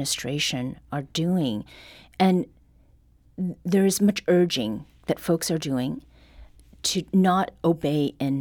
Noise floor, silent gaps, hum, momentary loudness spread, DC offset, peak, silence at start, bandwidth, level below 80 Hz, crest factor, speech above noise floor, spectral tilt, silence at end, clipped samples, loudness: -57 dBFS; none; none; 13 LU; under 0.1%; -10 dBFS; 0 s; 19 kHz; -56 dBFS; 16 dB; 33 dB; -5 dB/octave; 0 s; under 0.1%; -24 LUFS